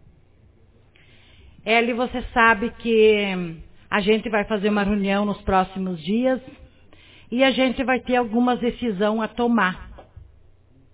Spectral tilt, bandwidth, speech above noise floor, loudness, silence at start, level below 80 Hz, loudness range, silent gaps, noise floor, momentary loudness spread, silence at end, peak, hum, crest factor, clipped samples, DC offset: -9.5 dB/octave; 4 kHz; 33 dB; -21 LUFS; 1.65 s; -46 dBFS; 3 LU; none; -54 dBFS; 10 LU; 0.7 s; -2 dBFS; none; 20 dB; under 0.1%; under 0.1%